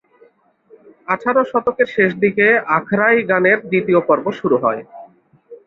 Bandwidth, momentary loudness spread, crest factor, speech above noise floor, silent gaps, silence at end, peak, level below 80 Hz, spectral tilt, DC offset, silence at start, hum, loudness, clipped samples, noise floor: 6.8 kHz; 7 LU; 16 dB; 37 dB; none; 0.1 s; -2 dBFS; -60 dBFS; -8 dB/octave; under 0.1%; 1.1 s; none; -16 LUFS; under 0.1%; -53 dBFS